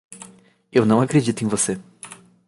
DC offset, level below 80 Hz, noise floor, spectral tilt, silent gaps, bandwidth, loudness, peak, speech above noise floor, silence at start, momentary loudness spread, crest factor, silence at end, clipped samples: under 0.1%; -58 dBFS; -49 dBFS; -5.5 dB/octave; none; 11.5 kHz; -20 LUFS; -4 dBFS; 31 dB; 0.1 s; 22 LU; 18 dB; 0.35 s; under 0.1%